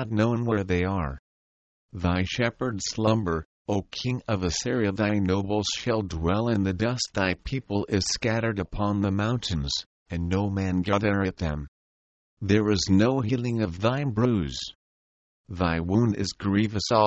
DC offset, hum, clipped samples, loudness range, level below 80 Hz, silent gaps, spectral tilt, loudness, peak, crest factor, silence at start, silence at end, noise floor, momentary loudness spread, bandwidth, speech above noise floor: under 0.1%; none; under 0.1%; 2 LU; -44 dBFS; 1.19-1.89 s, 3.45-3.65 s, 9.86-10.06 s, 11.68-12.37 s, 14.75-15.44 s; -5.5 dB/octave; -26 LUFS; -6 dBFS; 20 dB; 0 s; 0 s; under -90 dBFS; 7 LU; 8.6 kHz; over 65 dB